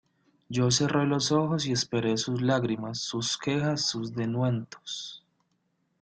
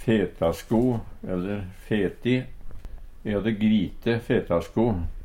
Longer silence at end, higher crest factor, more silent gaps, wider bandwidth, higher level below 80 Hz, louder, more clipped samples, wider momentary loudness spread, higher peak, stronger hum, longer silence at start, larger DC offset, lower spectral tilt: first, 0.85 s vs 0 s; about the same, 18 dB vs 16 dB; neither; second, 9.2 kHz vs 16 kHz; second, -64 dBFS vs -40 dBFS; about the same, -28 LUFS vs -26 LUFS; neither; about the same, 10 LU vs 10 LU; about the same, -12 dBFS vs -10 dBFS; neither; first, 0.5 s vs 0 s; neither; second, -4.5 dB/octave vs -7.5 dB/octave